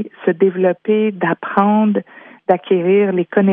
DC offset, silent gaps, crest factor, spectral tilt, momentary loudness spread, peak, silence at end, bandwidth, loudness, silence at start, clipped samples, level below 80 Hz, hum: under 0.1%; none; 14 dB; -11 dB/octave; 6 LU; 0 dBFS; 0 s; 3.7 kHz; -16 LUFS; 0 s; under 0.1%; -70 dBFS; none